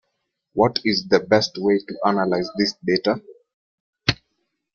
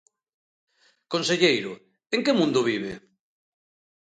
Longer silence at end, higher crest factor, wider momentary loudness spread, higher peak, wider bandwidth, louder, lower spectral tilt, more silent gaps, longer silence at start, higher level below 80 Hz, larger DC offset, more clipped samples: second, 0.6 s vs 1.15 s; about the same, 22 dB vs 22 dB; second, 6 LU vs 16 LU; first, -2 dBFS vs -6 dBFS; second, 7.2 kHz vs 9.4 kHz; first, -21 LUFS vs -24 LUFS; about the same, -5 dB/octave vs -4 dB/octave; first, 3.54-3.93 s vs none; second, 0.55 s vs 1.1 s; first, -54 dBFS vs -68 dBFS; neither; neither